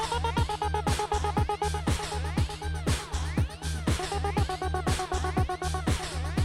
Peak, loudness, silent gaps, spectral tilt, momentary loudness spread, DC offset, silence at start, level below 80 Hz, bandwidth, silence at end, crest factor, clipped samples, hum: -14 dBFS; -30 LUFS; none; -5 dB/octave; 3 LU; under 0.1%; 0 s; -34 dBFS; 15 kHz; 0 s; 16 dB; under 0.1%; none